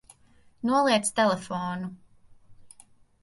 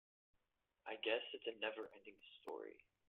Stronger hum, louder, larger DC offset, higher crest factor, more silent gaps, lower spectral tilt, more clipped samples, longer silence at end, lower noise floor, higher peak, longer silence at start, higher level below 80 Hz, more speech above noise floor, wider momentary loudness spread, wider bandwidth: neither; first, -26 LUFS vs -46 LUFS; neither; about the same, 20 dB vs 24 dB; neither; first, -4 dB/octave vs 1 dB/octave; neither; first, 0.55 s vs 0.3 s; second, -58 dBFS vs -87 dBFS; first, -8 dBFS vs -26 dBFS; second, 0.65 s vs 0.85 s; first, -64 dBFS vs under -90 dBFS; second, 33 dB vs 39 dB; second, 12 LU vs 16 LU; first, 11.5 kHz vs 4.3 kHz